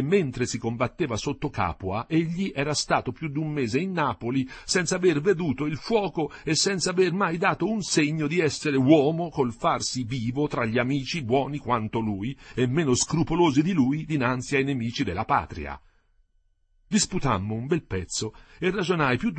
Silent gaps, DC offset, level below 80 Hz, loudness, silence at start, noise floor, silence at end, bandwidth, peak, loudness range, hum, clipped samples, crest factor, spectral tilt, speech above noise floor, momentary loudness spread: none; under 0.1%; -50 dBFS; -25 LUFS; 0 s; -66 dBFS; 0 s; 8.8 kHz; -4 dBFS; 5 LU; none; under 0.1%; 20 dB; -5 dB/octave; 41 dB; 7 LU